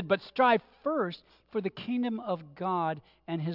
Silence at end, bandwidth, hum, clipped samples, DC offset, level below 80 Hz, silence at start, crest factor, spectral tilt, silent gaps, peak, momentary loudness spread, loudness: 0 s; 5.8 kHz; none; under 0.1%; under 0.1%; -72 dBFS; 0 s; 20 dB; -9 dB/octave; none; -12 dBFS; 12 LU; -31 LUFS